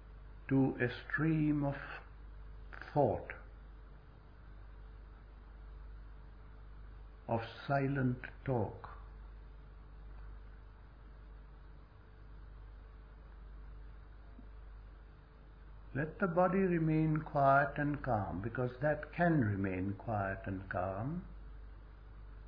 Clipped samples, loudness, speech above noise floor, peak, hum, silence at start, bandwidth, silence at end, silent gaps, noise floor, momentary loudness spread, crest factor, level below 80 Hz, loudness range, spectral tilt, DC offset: under 0.1%; -35 LUFS; 22 dB; -16 dBFS; none; 0 s; 5.2 kHz; 0 s; none; -56 dBFS; 25 LU; 22 dB; -52 dBFS; 23 LU; -7.5 dB/octave; under 0.1%